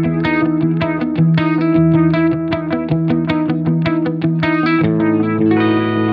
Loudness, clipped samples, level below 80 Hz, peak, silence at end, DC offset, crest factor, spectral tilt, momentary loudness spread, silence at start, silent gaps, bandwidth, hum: -15 LUFS; under 0.1%; -48 dBFS; -2 dBFS; 0 s; under 0.1%; 12 dB; -10 dB/octave; 5 LU; 0 s; none; 5.2 kHz; none